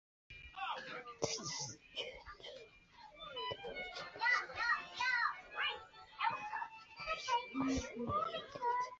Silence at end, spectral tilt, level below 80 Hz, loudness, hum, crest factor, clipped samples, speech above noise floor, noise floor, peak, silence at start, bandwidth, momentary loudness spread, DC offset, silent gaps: 0 s; -1 dB/octave; -64 dBFS; -40 LUFS; none; 20 dB; under 0.1%; 21 dB; -61 dBFS; -22 dBFS; 0.3 s; 7.6 kHz; 18 LU; under 0.1%; none